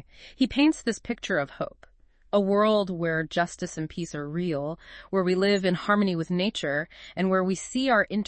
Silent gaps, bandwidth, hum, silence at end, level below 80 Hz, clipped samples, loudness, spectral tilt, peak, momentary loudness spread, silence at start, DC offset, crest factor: none; 8.8 kHz; none; 0 s; -56 dBFS; under 0.1%; -26 LUFS; -5.5 dB/octave; -10 dBFS; 11 LU; 0.2 s; under 0.1%; 16 dB